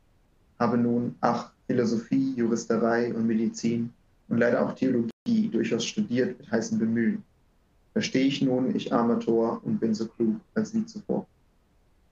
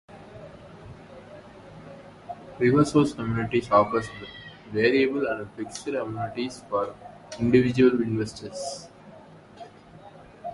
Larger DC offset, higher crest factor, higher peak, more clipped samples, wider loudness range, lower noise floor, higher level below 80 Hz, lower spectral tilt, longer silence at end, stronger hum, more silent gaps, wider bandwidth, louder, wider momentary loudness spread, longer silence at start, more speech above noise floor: neither; about the same, 20 dB vs 22 dB; about the same, -6 dBFS vs -6 dBFS; neither; about the same, 2 LU vs 4 LU; first, -64 dBFS vs -48 dBFS; second, -66 dBFS vs -54 dBFS; about the same, -6 dB/octave vs -6.5 dB/octave; first, 0.9 s vs 0 s; neither; first, 5.13-5.26 s vs none; second, 7.6 kHz vs 11.5 kHz; about the same, -27 LUFS vs -25 LUFS; second, 6 LU vs 25 LU; first, 0.6 s vs 0.1 s; first, 38 dB vs 24 dB